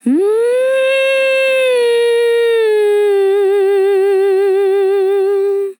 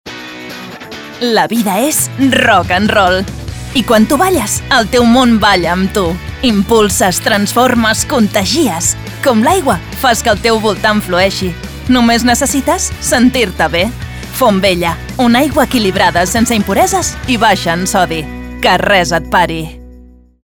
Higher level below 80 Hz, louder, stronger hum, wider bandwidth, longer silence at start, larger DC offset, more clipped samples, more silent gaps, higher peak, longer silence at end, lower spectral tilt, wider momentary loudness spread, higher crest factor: second, under -90 dBFS vs -30 dBFS; about the same, -12 LUFS vs -11 LUFS; neither; second, 17.5 kHz vs over 20 kHz; about the same, 0.05 s vs 0.05 s; second, under 0.1% vs 0.2%; neither; neither; second, -6 dBFS vs 0 dBFS; second, 0.05 s vs 0.45 s; about the same, -3 dB/octave vs -3.5 dB/octave; second, 1 LU vs 9 LU; about the same, 8 dB vs 12 dB